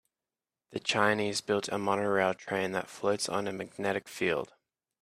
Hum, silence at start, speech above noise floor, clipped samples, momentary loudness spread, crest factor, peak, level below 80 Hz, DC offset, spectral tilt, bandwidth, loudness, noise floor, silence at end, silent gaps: none; 0.7 s; over 59 dB; under 0.1%; 8 LU; 22 dB; -10 dBFS; -72 dBFS; under 0.1%; -4 dB/octave; 15.5 kHz; -31 LUFS; under -90 dBFS; 0.55 s; none